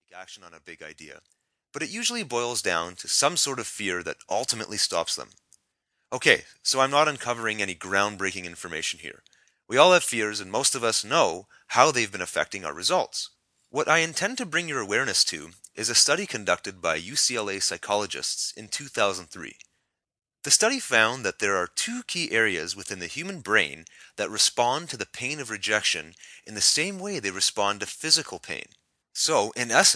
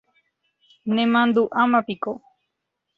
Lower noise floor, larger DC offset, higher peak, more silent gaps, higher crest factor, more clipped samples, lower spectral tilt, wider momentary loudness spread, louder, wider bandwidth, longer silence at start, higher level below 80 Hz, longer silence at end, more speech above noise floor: about the same, -78 dBFS vs -79 dBFS; neither; first, -2 dBFS vs -6 dBFS; neither; first, 24 dB vs 18 dB; neither; second, -1 dB/octave vs -7.5 dB/octave; about the same, 15 LU vs 14 LU; second, -24 LUFS vs -21 LUFS; first, 11 kHz vs 4.8 kHz; second, 0.15 s vs 0.85 s; about the same, -68 dBFS vs -68 dBFS; second, 0 s vs 0.8 s; second, 52 dB vs 59 dB